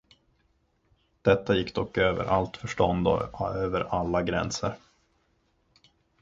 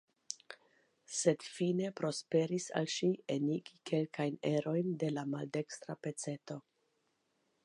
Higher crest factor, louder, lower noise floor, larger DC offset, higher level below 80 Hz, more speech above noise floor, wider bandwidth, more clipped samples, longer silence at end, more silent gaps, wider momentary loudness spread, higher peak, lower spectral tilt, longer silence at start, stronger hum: about the same, 22 dB vs 22 dB; first, -27 LUFS vs -37 LUFS; second, -70 dBFS vs -80 dBFS; neither; first, -48 dBFS vs -86 dBFS; about the same, 43 dB vs 44 dB; second, 7.8 kHz vs 11.5 kHz; neither; first, 1.45 s vs 1.05 s; neither; second, 7 LU vs 12 LU; first, -6 dBFS vs -16 dBFS; about the same, -5.5 dB/octave vs -5 dB/octave; first, 1.25 s vs 0.3 s; neither